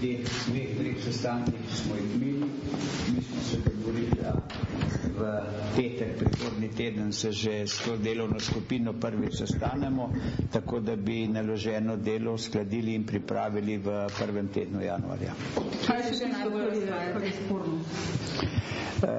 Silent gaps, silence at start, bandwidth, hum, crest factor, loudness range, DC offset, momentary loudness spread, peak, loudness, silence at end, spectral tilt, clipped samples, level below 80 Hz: none; 0 s; 8 kHz; none; 16 dB; 1 LU; under 0.1%; 3 LU; -14 dBFS; -31 LUFS; 0 s; -6 dB/octave; under 0.1%; -48 dBFS